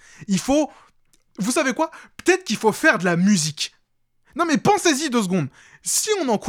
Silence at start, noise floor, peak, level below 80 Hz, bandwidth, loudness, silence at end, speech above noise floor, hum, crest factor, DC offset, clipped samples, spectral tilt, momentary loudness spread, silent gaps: 0.2 s; -65 dBFS; -2 dBFS; -56 dBFS; 18.5 kHz; -21 LUFS; 0 s; 45 dB; none; 20 dB; under 0.1%; under 0.1%; -4 dB/octave; 11 LU; none